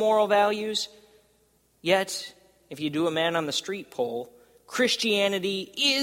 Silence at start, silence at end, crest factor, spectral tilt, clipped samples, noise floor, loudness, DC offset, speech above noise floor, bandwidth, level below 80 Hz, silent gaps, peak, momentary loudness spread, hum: 0 s; 0 s; 18 dB; -3 dB/octave; under 0.1%; -66 dBFS; -26 LUFS; under 0.1%; 40 dB; 16.5 kHz; -72 dBFS; none; -8 dBFS; 13 LU; none